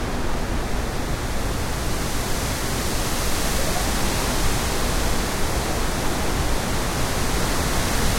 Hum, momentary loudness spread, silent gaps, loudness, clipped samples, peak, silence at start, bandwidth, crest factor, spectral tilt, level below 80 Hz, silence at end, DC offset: none; 4 LU; none; -24 LUFS; under 0.1%; -8 dBFS; 0 s; 16.5 kHz; 14 dB; -3.5 dB/octave; -26 dBFS; 0 s; under 0.1%